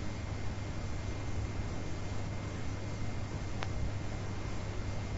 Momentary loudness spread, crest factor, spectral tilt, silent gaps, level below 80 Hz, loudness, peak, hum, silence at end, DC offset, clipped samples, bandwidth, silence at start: 2 LU; 20 dB; -6 dB/octave; none; -42 dBFS; -40 LUFS; -16 dBFS; none; 0 s; under 0.1%; under 0.1%; 7.6 kHz; 0 s